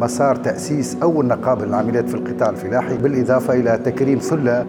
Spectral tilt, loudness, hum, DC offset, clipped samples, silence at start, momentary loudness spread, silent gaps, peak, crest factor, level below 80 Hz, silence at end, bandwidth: -7 dB/octave; -18 LUFS; none; under 0.1%; under 0.1%; 0 s; 5 LU; none; -4 dBFS; 14 dB; -56 dBFS; 0 s; 16.5 kHz